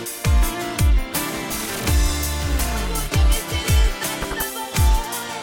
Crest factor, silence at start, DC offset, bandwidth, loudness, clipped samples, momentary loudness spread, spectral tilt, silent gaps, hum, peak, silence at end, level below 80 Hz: 12 dB; 0 s; under 0.1%; 17 kHz; -22 LUFS; under 0.1%; 5 LU; -4 dB/octave; none; none; -8 dBFS; 0 s; -22 dBFS